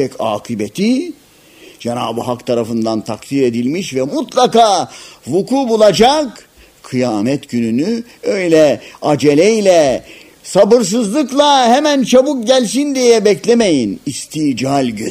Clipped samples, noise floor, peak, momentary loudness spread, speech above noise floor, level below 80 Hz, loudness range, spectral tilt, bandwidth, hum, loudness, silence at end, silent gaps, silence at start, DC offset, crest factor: under 0.1%; -42 dBFS; 0 dBFS; 10 LU; 29 dB; -50 dBFS; 7 LU; -4.5 dB/octave; 15.5 kHz; none; -13 LUFS; 0 s; none; 0 s; under 0.1%; 14 dB